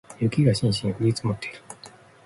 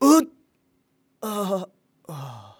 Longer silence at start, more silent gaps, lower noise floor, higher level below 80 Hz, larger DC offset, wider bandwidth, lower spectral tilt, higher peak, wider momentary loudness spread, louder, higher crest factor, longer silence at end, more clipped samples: about the same, 0.1 s vs 0 s; neither; second, -49 dBFS vs -68 dBFS; first, -52 dBFS vs -76 dBFS; neither; second, 11.5 kHz vs over 20 kHz; first, -6.5 dB/octave vs -5 dB/octave; second, -8 dBFS vs -4 dBFS; about the same, 21 LU vs 21 LU; about the same, -24 LUFS vs -24 LUFS; about the same, 18 dB vs 22 dB; first, 0.4 s vs 0.15 s; neither